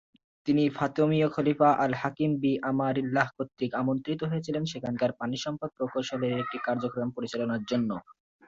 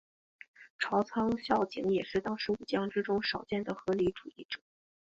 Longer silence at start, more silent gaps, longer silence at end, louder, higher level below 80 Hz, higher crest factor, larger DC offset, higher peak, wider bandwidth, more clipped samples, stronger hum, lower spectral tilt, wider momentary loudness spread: second, 0.45 s vs 0.6 s; second, none vs 0.70-0.79 s, 4.45-4.49 s; second, 0.35 s vs 0.6 s; first, -29 LUFS vs -33 LUFS; about the same, -66 dBFS vs -64 dBFS; about the same, 18 dB vs 20 dB; neither; first, -10 dBFS vs -14 dBFS; about the same, 7.8 kHz vs 7.8 kHz; neither; neither; about the same, -6.5 dB/octave vs -6 dB/octave; second, 8 LU vs 12 LU